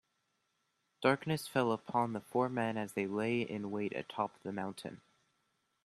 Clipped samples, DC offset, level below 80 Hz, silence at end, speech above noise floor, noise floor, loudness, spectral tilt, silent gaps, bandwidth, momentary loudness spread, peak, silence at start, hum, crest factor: under 0.1%; under 0.1%; -76 dBFS; 0.9 s; 45 dB; -81 dBFS; -36 LUFS; -6 dB/octave; none; 13.5 kHz; 8 LU; -12 dBFS; 1 s; none; 24 dB